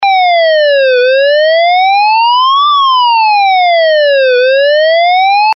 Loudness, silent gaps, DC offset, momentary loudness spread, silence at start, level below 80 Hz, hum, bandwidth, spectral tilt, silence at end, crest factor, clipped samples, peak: -7 LUFS; none; under 0.1%; 0 LU; 0 s; -70 dBFS; none; 5.8 kHz; 7.5 dB/octave; 0 s; 2 dB; under 0.1%; -4 dBFS